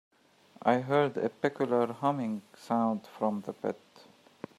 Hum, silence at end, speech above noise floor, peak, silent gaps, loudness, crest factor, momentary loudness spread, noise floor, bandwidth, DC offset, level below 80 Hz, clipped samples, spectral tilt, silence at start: none; 0.85 s; 31 dB; -10 dBFS; none; -31 LUFS; 22 dB; 10 LU; -61 dBFS; 13.5 kHz; under 0.1%; -80 dBFS; under 0.1%; -7.5 dB/octave; 0.65 s